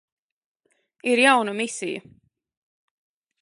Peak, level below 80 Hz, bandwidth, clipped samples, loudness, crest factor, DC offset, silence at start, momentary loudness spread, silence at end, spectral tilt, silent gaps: -2 dBFS; -78 dBFS; 11.5 kHz; under 0.1%; -21 LUFS; 24 dB; under 0.1%; 1.05 s; 15 LU; 1.4 s; -2.5 dB/octave; none